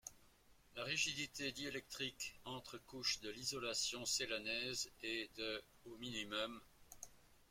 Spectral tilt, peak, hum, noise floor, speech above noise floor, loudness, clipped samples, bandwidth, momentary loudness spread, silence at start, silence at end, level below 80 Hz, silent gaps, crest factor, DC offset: -1.5 dB/octave; -26 dBFS; none; -69 dBFS; 24 dB; -43 LUFS; under 0.1%; 16.5 kHz; 17 LU; 0.05 s; 0.05 s; -72 dBFS; none; 22 dB; under 0.1%